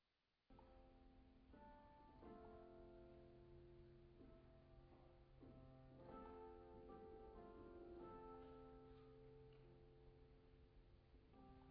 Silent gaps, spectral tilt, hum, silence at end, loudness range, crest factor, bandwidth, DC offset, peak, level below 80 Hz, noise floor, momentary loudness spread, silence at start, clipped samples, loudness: none; -7 dB/octave; none; 0 s; 5 LU; 16 dB; 4.9 kHz; under 0.1%; -48 dBFS; -72 dBFS; -90 dBFS; 9 LU; 0.5 s; under 0.1%; -64 LUFS